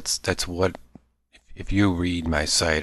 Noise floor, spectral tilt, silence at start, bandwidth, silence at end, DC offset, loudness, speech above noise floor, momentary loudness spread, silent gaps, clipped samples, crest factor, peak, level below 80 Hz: -60 dBFS; -3.5 dB/octave; 0 s; 13 kHz; 0 s; under 0.1%; -24 LUFS; 36 dB; 6 LU; none; under 0.1%; 20 dB; -6 dBFS; -38 dBFS